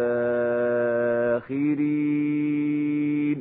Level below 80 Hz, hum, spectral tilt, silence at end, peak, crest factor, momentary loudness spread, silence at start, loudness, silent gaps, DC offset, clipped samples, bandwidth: -66 dBFS; none; -12 dB/octave; 0 s; -14 dBFS; 10 dB; 1 LU; 0 s; -24 LUFS; none; under 0.1%; under 0.1%; 3.9 kHz